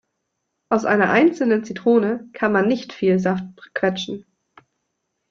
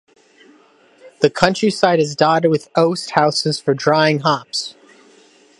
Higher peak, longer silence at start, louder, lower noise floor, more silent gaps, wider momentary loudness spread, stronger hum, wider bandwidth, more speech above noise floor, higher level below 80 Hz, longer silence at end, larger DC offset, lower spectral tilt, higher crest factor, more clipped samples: second, -4 dBFS vs 0 dBFS; second, 0.7 s vs 1.05 s; second, -20 LUFS vs -16 LUFS; first, -76 dBFS vs -51 dBFS; neither; first, 11 LU vs 5 LU; neither; second, 7.6 kHz vs 11.5 kHz; first, 57 dB vs 35 dB; second, -62 dBFS vs -54 dBFS; first, 1.1 s vs 0.9 s; neither; first, -6.5 dB/octave vs -5 dB/octave; about the same, 18 dB vs 18 dB; neither